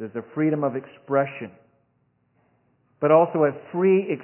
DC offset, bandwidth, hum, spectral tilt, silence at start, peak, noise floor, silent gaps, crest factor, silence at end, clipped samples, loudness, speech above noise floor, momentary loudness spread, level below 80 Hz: under 0.1%; 3.2 kHz; 60 Hz at -65 dBFS; -11.5 dB/octave; 0 s; -4 dBFS; -68 dBFS; none; 20 dB; 0 s; under 0.1%; -22 LUFS; 46 dB; 15 LU; -76 dBFS